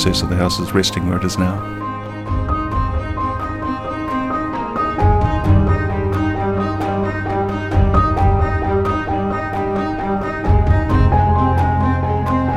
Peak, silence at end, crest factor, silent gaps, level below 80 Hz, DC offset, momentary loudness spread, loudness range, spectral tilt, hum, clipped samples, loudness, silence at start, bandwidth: 0 dBFS; 0 s; 16 dB; none; -24 dBFS; under 0.1%; 7 LU; 4 LU; -6.5 dB/octave; none; under 0.1%; -18 LUFS; 0 s; 14 kHz